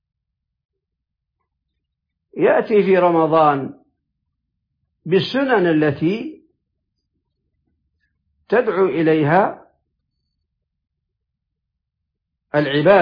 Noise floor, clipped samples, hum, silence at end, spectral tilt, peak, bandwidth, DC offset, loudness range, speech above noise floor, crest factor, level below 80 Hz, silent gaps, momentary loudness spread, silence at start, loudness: -80 dBFS; under 0.1%; none; 0 s; -8.5 dB/octave; -2 dBFS; 5.2 kHz; under 0.1%; 5 LU; 64 dB; 18 dB; -62 dBFS; none; 10 LU; 2.35 s; -17 LUFS